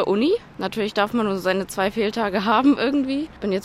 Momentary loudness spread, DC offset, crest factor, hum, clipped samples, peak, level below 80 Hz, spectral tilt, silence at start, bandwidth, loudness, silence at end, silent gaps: 8 LU; under 0.1%; 16 dB; none; under 0.1%; -4 dBFS; -52 dBFS; -5.5 dB/octave; 0 s; 15 kHz; -22 LUFS; 0 s; none